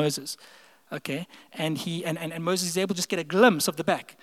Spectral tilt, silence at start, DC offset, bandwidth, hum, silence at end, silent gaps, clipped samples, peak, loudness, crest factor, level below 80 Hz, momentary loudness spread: -4 dB/octave; 0 s; under 0.1%; 16.5 kHz; none; 0.1 s; none; under 0.1%; -4 dBFS; -26 LUFS; 24 dB; -82 dBFS; 17 LU